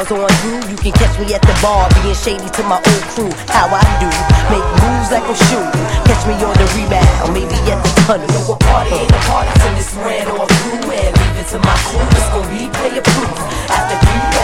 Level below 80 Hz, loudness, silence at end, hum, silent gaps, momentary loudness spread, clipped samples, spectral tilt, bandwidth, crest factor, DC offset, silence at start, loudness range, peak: -18 dBFS; -13 LUFS; 0 s; none; none; 6 LU; 0.3%; -5 dB/octave; 16 kHz; 12 dB; under 0.1%; 0 s; 2 LU; 0 dBFS